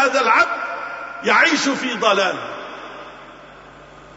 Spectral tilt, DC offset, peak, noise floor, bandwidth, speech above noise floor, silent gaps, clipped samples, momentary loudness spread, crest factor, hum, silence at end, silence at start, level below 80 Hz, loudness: -2.5 dB/octave; under 0.1%; -2 dBFS; -42 dBFS; 8 kHz; 24 dB; none; under 0.1%; 21 LU; 18 dB; none; 0 s; 0 s; -60 dBFS; -17 LUFS